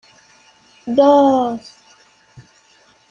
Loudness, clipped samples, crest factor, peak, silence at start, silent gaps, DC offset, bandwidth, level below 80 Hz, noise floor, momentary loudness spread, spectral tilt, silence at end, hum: -14 LUFS; under 0.1%; 16 dB; -2 dBFS; 0.85 s; none; under 0.1%; 7.4 kHz; -60 dBFS; -53 dBFS; 20 LU; -6 dB/octave; 0.7 s; none